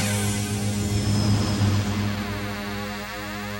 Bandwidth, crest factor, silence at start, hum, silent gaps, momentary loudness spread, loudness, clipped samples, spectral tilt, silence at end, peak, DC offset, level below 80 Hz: 16.5 kHz; 14 dB; 0 s; none; none; 9 LU; -25 LUFS; under 0.1%; -5 dB/octave; 0 s; -10 dBFS; under 0.1%; -40 dBFS